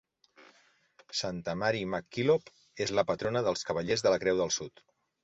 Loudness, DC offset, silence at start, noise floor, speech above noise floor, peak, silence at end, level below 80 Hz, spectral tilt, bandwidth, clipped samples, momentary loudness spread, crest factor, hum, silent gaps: -31 LUFS; under 0.1%; 0.4 s; -65 dBFS; 35 dB; -12 dBFS; 0.55 s; -64 dBFS; -4 dB/octave; 8.2 kHz; under 0.1%; 8 LU; 20 dB; none; none